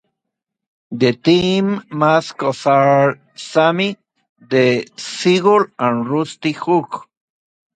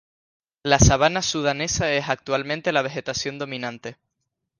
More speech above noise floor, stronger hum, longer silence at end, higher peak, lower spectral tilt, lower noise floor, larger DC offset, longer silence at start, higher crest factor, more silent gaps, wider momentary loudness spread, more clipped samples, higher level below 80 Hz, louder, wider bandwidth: first, 64 dB vs 57 dB; neither; about the same, 0.75 s vs 0.65 s; about the same, 0 dBFS vs -2 dBFS; first, -6 dB/octave vs -4 dB/octave; about the same, -80 dBFS vs -79 dBFS; neither; first, 0.9 s vs 0.65 s; second, 16 dB vs 22 dB; first, 4.29-4.36 s vs none; second, 9 LU vs 15 LU; neither; second, -58 dBFS vs -36 dBFS; first, -16 LUFS vs -22 LUFS; second, 9.4 kHz vs 10.5 kHz